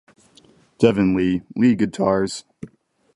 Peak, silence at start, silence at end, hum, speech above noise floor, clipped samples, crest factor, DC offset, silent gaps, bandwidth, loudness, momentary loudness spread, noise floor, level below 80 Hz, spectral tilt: -2 dBFS; 0.8 s; 0.5 s; none; 35 dB; under 0.1%; 20 dB; under 0.1%; none; 11.5 kHz; -19 LUFS; 23 LU; -54 dBFS; -50 dBFS; -6.5 dB/octave